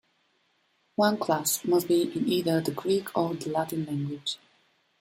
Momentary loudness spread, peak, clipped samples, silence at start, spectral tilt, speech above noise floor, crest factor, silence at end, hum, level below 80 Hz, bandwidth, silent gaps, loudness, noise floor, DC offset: 8 LU; -10 dBFS; under 0.1%; 1 s; -4.5 dB/octave; 44 dB; 18 dB; 0.65 s; none; -70 dBFS; 16.5 kHz; none; -27 LUFS; -70 dBFS; under 0.1%